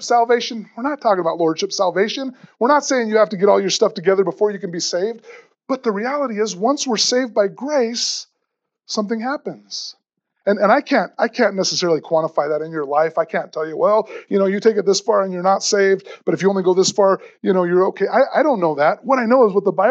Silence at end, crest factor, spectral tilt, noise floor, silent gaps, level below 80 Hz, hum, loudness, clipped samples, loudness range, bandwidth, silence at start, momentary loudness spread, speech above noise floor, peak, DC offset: 0 s; 16 dB; -4 dB/octave; -77 dBFS; none; -88 dBFS; none; -18 LUFS; under 0.1%; 4 LU; 8.2 kHz; 0 s; 9 LU; 59 dB; -2 dBFS; under 0.1%